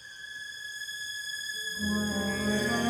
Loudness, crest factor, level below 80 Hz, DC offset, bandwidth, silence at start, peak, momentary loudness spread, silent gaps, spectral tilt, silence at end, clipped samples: -32 LUFS; 16 dB; -56 dBFS; under 0.1%; 18 kHz; 0 s; -16 dBFS; 10 LU; none; -3.5 dB/octave; 0 s; under 0.1%